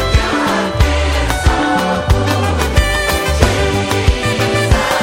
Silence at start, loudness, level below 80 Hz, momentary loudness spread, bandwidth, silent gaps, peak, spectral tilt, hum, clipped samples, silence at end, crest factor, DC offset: 0 s; -14 LUFS; -18 dBFS; 2 LU; 17 kHz; none; 0 dBFS; -5 dB/octave; none; under 0.1%; 0 s; 14 dB; under 0.1%